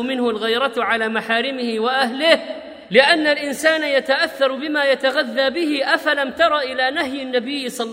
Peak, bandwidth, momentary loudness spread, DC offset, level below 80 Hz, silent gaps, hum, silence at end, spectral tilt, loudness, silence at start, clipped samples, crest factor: 0 dBFS; 16 kHz; 7 LU; under 0.1%; -62 dBFS; none; none; 0 s; -3 dB/octave; -18 LUFS; 0 s; under 0.1%; 18 dB